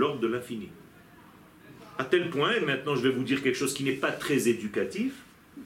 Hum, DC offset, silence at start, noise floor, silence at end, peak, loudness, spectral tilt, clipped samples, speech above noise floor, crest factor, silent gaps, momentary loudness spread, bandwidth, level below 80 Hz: none; under 0.1%; 0 s; -53 dBFS; 0 s; -10 dBFS; -28 LUFS; -4.5 dB/octave; under 0.1%; 25 dB; 18 dB; none; 12 LU; 17 kHz; -68 dBFS